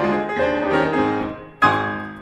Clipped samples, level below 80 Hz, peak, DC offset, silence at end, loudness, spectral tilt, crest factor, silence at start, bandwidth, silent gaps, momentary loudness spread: under 0.1%; -50 dBFS; -2 dBFS; under 0.1%; 0 s; -20 LUFS; -6.5 dB/octave; 18 dB; 0 s; 11 kHz; none; 8 LU